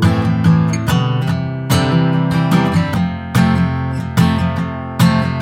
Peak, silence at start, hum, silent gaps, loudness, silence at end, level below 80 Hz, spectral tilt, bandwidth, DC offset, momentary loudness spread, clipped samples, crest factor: 0 dBFS; 0 s; none; none; -15 LUFS; 0 s; -36 dBFS; -6.5 dB/octave; 16 kHz; under 0.1%; 6 LU; under 0.1%; 14 dB